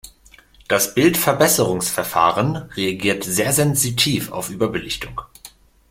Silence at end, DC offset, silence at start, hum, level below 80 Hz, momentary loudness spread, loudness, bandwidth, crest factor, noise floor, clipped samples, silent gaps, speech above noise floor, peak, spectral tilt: 0.4 s; under 0.1%; 0.05 s; none; -48 dBFS; 10 LU; -18 LUFS; 16.5 kHz; 18 dB; -49 dBFS; under 0.1%; none; 31 dB; -2 dBFS; -3.5 dB/octave